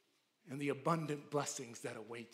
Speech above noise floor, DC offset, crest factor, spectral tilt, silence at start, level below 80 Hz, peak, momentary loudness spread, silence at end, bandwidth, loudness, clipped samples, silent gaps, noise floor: 26 dB; under 0.1%; 20 dB; -5 dB/octave; 0.45 s; under -90 dBFS; -22 dBFS; 10 LU; 0.05 s; 16 kHz; -41 LUFS; under 0.1%; none; -67 dBFS